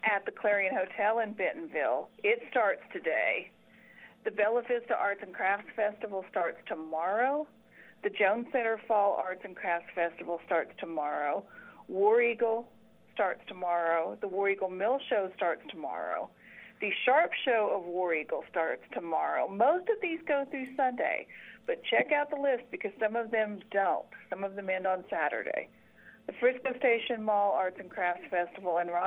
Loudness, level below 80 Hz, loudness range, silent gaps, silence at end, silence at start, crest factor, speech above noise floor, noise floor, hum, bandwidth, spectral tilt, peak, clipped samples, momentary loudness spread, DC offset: -31 LUFS; -80 dBFS; 2 LU; none; 0 s; 0.05 s; 18 dB; 25 dB; -56 dBFS; none; 4 kHz; -6.5 dB/octave; -12 dBFS; under 0.1%; 10 LU; under 0.1%